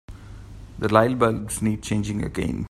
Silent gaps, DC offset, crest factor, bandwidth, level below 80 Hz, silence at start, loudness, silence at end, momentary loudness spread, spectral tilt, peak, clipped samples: none; under 0.1%; 24 dB; 15.5 kHz; -42 dBFS; 0.1 s; -23 LUFS; 0.05 s; 23 LU; -6 dB/octave; 0 dBFS; under 0.1%